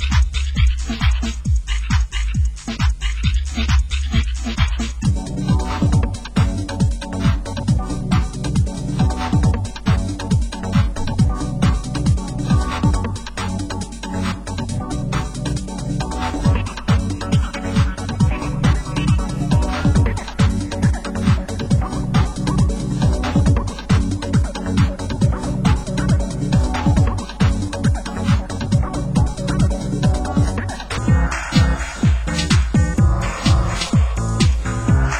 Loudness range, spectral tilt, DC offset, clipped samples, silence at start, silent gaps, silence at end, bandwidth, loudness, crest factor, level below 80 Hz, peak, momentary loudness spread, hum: 3 LU; -6 dB/octave; under 0.1%; under 0.1%; 0 s; none; 0 s; 11.5 kHz; -20 LUFS; 16 dB; -22 dBFS; -2 dBFS; 5 LU; none